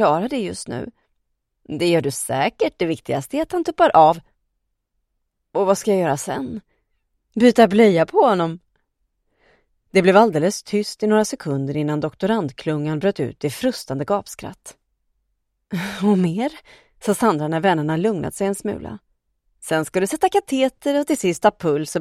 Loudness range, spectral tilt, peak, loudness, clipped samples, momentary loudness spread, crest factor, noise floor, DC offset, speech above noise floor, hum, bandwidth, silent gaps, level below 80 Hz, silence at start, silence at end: 7 LU; -5.5 dB/octave; 0 dBFS; -20 LUFS; under 0.1%; 14 LU; 20 dB; -74 dBFS; under 0.1%; 55 dB; none; 15.5 kHz; none; -56 dBFS; 0 s; 0 s